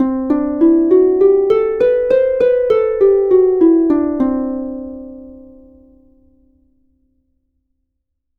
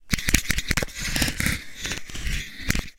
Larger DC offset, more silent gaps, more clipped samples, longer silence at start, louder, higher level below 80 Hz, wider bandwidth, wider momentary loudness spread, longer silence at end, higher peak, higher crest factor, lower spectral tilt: neither; neither; neither; about the same, 0 s vs 0 s; first, -13 LUFS vs -26 LUFS; second, -46 dBFS vs -32 dBFS; second, 4.2 kHz vs 17 kHz; first, 13 LU vs 9 LU; first, 3 s vs 0.05 s; about the same, -2 dBFS vs 0 dBFS; second, 14 dB vs 26 dB; first, -8.5 dB/octave vs -2.5 dB/octave